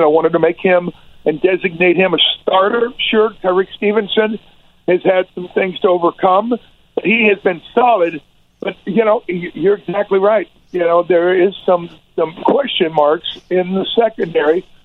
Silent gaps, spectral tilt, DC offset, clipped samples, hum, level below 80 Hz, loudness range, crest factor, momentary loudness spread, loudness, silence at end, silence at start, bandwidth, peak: none; -7.5 dB/octave; under 0.1%; under 0.1%; none; -54 dBFS; 2 LU; 14 dB; 9 LU; -15 LUFS; 0.2 s; 0 s; 4.2 kHz; 0 dBFS